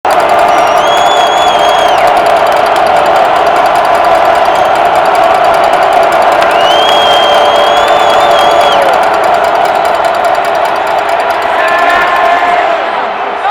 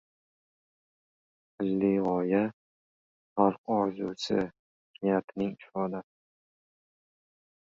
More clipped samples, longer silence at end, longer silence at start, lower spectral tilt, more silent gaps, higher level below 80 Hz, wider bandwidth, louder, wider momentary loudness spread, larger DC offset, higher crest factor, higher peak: first, 0.6% vs under 0.1%; second, 0 s vs 1.65 s; second, 0.05 s vs 1.6 s; second, -2.5 dB/octave vs -7 dB/octave; second, none vs 2.53-3.36 s, 3.58-3.64 s, 4.59-4.94 s, 5.24-5.28 s; first, -40 dBFS vs -68 dBFS; first, 17.5 kHz vs 7.6 kHz; first, -7 LUFS vs -30 LUFS; second, 4 LU vs 8 LU; neither; second, 8 dB vs 24 dB; first, 0 dBFS vs -8 dBFS